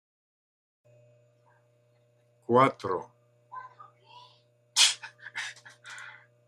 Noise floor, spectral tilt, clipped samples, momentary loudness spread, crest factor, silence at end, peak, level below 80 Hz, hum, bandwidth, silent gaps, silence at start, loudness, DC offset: -66 dBFS; -2 dB/octave; under 0.1%; 25 LU; 26 dB; 0.35 s; -8 dBFS; -80 dBFS; 60 Hz at -60 dBFS; 13.5 kHz; none; 2.5 s; -26 LUFS; under 0.1%